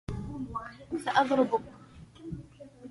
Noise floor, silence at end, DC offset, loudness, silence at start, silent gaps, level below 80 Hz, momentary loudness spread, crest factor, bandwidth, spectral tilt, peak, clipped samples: -50 dBFS; 0 s; under 0.1%; -30 LUFS; 0.1 s; none; -52 dBFS; 24 LU; 22 dB; 11.5 kHz; -6 dB/octave; -10 dBFS; under 0.1%